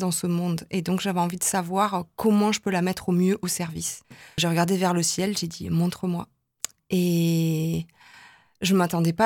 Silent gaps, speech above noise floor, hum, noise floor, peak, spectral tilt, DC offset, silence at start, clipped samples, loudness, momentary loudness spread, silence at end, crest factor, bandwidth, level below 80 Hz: none; 28 dB; none; -52 dBFS; -6 dBFS; -5 dB/octave; under 0.1%; 0 s; under 0.1%; -25 LUFS; 10 LU; 0 s; 20 dB; 17.5 kHz; -58 dBFS